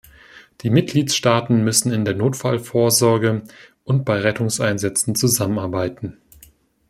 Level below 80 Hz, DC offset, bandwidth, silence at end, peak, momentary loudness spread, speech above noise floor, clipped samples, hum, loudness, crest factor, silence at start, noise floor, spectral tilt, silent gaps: -56 dBFS; under 0.1%; 16 kHz; 0.75 s; -2 dBFS; 10 LU; 33 dB; under 0.1%; none; -19 LUFS; 18 dB; 0.35 s; -51 dBFS; -4.5 dB/octave; none